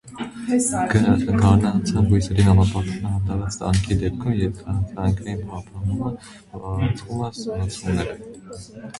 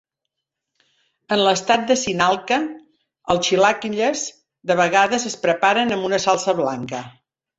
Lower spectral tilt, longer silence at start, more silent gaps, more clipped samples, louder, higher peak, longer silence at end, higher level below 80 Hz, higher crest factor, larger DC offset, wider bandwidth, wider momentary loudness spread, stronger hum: first, -6.5 dB/octave vs -3 dB/octave; second, 0.05 s vs 1.3 s; neither; neither; second, -22 LUFS vs -19 LUFS; about the same, -2 dBFS vs -2 dBFS; second, 0 s vs 0.5 s; first, -34 dBFS vs -58 dBFS; about the same, 20 dB vs 18 dB; neither; first, 11.5 kHz vs 8.2 kHz; first, 17 LU vs 12 LU; neither